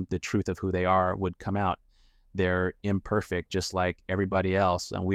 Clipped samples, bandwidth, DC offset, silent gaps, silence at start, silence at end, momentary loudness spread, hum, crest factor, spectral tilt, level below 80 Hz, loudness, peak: under 0.1%; 14 kHz; under 0.1%; none; 0 s; 0 s; 6 LU; none; 16 dB; -6 dB/octave; -50 dBFS; -28 LUFS; -12 dBFS